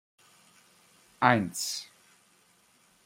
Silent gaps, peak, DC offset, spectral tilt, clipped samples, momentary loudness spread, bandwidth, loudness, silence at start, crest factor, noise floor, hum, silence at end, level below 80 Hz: none; -6 dBFS; under 0.1%; -4 dB/octave; under 0.1%; 15 LU; 16 kHz; -28 LUFS; 1.2 s; 28 dB; -65 dBFS; 50 Hz at -60 dBFS; 1.2 s; -74 dBFS